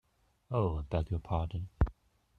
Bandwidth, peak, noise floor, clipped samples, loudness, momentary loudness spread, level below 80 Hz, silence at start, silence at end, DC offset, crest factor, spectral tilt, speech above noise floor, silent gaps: 4.6 kHz; -12 dBFS; -57 dBFS; under 0.1%; -35 LUFS; 3 LU; -42 dBFS; 0.5 s; 0.45 s; under 0.1%; 22 dB; -9.5 dB/octave; 23 dB; none